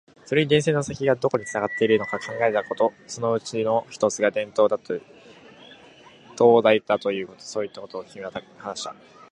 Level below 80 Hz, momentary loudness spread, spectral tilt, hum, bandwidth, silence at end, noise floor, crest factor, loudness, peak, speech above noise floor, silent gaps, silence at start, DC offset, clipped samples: -64 dBFS; 15 LU; -5 dB/octave; none; 10.5 kHz; 0.4 s; -50 dBFS; 20 dB; -23 LUFS; -2 dBFS; 27 dB; none; 0.3 s; under 0.1%; under 0.1%